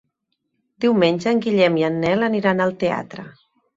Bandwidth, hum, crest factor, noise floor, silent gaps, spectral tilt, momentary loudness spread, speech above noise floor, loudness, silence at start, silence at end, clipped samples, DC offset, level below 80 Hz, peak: 7.8 kHz; none; 16 dB; -74 dBFS; none; -6.5 dB/octave; 8 LU; 56 dB; -19 LUFS; 0.8 s; 0.45 s; under 0.1%; under 0.1%; -60 dBFS; -4 dBFS